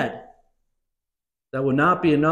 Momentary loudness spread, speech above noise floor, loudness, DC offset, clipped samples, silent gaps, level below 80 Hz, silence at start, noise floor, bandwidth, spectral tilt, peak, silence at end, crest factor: 15 LU; 68 dB; -21 LUFS; under 0.1%; under 0.1%; none; -56 dBFS; 0 s; -88 dBFS; 9 kHz; -8 dB/octave; -8 dBFS; 0 s; 16 dB